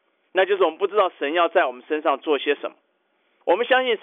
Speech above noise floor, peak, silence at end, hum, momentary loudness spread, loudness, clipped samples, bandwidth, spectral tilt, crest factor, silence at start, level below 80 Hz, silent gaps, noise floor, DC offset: 47 dB; -8 dBFS; 0.05 s; none; 7 LU; -22 LUFS; under 0.1%; 4.1 kHz; -5 dB/octave; 14 dB; 0.35 s; -78 dBFS; none; -68 dBFS; under 0.1%